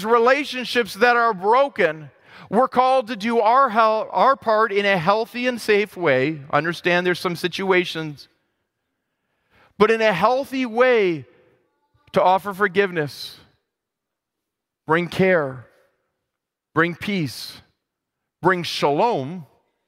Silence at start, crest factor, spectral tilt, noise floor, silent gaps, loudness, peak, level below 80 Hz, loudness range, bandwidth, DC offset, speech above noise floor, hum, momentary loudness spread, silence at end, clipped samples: 0 s; 18 dB; -5.5 dB/octave; -83 dBFS; none; -20 LUFS; -2 dBFS; -64 dBFS; 6 LU; 16 kHz; under 0.1%; 63 dB; none; 10 LU; 0.45 s; under 0.1%